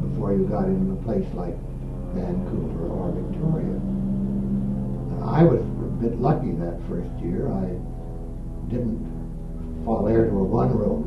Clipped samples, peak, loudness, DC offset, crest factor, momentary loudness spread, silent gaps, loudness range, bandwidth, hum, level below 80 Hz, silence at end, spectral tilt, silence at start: under 0.1%; -4 dBFS; -25 LUFS; under 0.1%; 20 dB; 13 LU; none; 5 LU; 6 kHz; none; -32 dBFS; 0 s; -10.5 dB/octave; 0 s